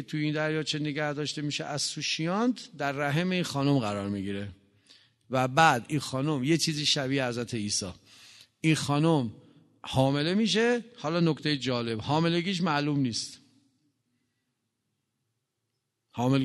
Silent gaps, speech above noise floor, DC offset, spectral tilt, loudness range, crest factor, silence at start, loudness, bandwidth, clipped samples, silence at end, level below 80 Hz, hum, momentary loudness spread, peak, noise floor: none; 54 dB; under 0.1%; -5 dB/octave; 4 LU; 24 dB; 0 s; -28 LUFS; 12 kHz; under 0.1%; 0 s; -64 dBFS; none; 8 LU; -6 dBFS; -82 dBFS